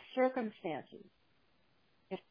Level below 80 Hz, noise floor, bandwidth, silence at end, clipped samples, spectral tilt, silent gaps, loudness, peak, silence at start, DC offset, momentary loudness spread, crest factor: -82 dBFS; -74 dBFS; 5.2 kHz; 0.1 s; under 0.1%; -4 dB/octave; none; -38 LUFS; -20 dBFS; 0 s; under 0.1%; 22 LU; 22 dB